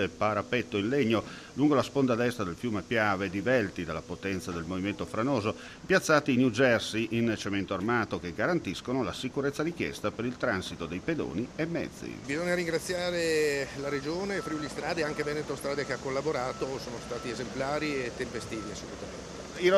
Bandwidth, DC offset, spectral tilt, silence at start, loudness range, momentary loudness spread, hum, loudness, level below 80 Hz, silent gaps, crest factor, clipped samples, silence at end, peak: 14 kHz; under 0.1%; -5 dB/octave; 0 s; 5 LU; 10 LU; none; -30 LUFS; -56 dBFS; none; 20 dB; under 0.1%; 0 s; -10 dBFS